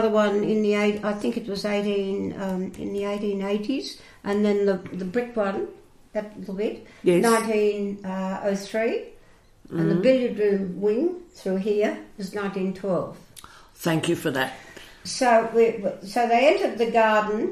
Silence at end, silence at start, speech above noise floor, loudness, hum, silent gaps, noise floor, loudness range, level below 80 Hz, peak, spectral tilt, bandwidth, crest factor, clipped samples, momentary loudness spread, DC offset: 0 s; 0 s; 29 dB; -24 LUFS; none; none; -53 dBFS; 5 LU; -58 dBFS; -6 dBFS; -5.5 dB/octave; 14 kHz; 18 dB; under 0.1%; 13 LU; under 0.1%